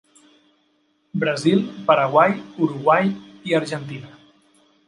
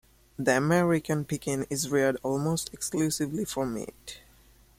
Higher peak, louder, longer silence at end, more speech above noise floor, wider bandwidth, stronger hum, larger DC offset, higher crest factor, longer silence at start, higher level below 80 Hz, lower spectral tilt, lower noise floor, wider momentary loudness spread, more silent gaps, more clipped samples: first, -2 dBFS vs -8 dBFS; first, -20 LUFS vs -28 LUFS; first, 0.8 s vs 0.6 s; first, 46 dB vs 30 dB; second, 11.5 kHz vs 16.5 kHz; neither; neither; about the same, 20 dB vs 20 dB; first, 1.15 s vs 0.4 s; second, -68 dBFS vs -58 dBFS; first, -6.5 dB/octave vs -5 dB/octave; first, -65 dBFS vs -58 dBFS; about the same, 14 LU vs 16 LU; neither; neither